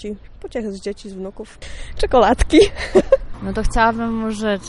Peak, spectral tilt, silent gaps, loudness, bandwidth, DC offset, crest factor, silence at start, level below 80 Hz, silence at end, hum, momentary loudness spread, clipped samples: 0 dBFS; -5 dB/octave; none; -17 LUFS; 11.5 kHz; under 0.1%; 18 dB; 0 s; -28 dBFS; 0 s; none; 20 LU; under 0.1%